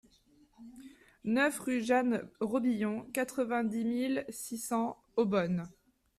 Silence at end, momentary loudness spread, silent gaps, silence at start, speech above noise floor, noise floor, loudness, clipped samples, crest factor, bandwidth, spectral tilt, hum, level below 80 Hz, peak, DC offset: 0.5 s; 10 LU; none; 0.6 s; 34 dB; -66 dBFS; -33 LUFS; under 0.1%; 18 dB; 14.5 kHz; -5.5 dB/octave; none; -70 dBFS; -16 dBFS; under 0.1%